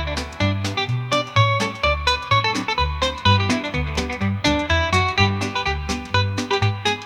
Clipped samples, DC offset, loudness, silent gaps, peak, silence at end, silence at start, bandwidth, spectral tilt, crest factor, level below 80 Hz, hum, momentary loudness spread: under 0.1%; under 0.1%; -20 LUFS; none; -2 dBFS; 0 s; 0 s; 13 kHz; -4.5 dB/octave; 18 dB; -34 dBFS; none; 6 LU